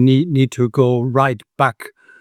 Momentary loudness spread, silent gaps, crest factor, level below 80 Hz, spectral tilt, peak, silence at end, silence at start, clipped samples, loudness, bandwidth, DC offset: 8 LU; none; 16 dB; -62 dBFS; -7.5 dB/octave; 0 dBFS; 0.3 s; 0 s; under 0.1%; -17 LUFS; 13 kHz; under 0.1%